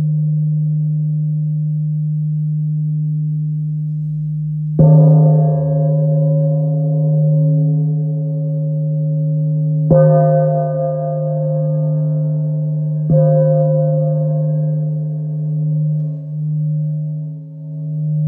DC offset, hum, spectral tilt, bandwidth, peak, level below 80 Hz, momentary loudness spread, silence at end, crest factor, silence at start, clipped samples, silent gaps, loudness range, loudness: under 0.1%; none; -15 dB/octave; 1.6 kHz; -2 dBFS; -50 dBFS; 9 LU; 0 s; 14 dB; 0 s; under 0.1%; none; 6 LU; -16 LUFS